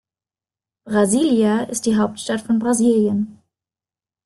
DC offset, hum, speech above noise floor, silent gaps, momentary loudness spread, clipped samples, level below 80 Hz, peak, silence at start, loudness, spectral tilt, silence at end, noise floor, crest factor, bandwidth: under 0.1%; none; over 72 dB; none; 7 LU; under 0.1%; -58 dBFS; -4 dBFS; 0.85 s; -18 LUFS; -5 dB/octave; 0.9 s; under -90 dBFS; 16 dB; 12.5 kHz